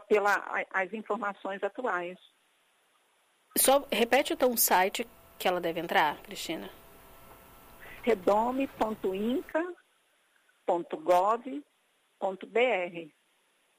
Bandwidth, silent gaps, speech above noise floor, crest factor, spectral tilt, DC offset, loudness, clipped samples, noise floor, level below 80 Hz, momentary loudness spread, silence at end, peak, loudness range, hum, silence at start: 15.5 kHz; none; 42 dB; 18 dB; -2.5 dB/octave; under 0.1%; -29 LUFS; under 0.1%; -71 dBFS; -64 dBFS; 14 LU; 0.7 s; -12 dBFS; 6 LU; none; 0 s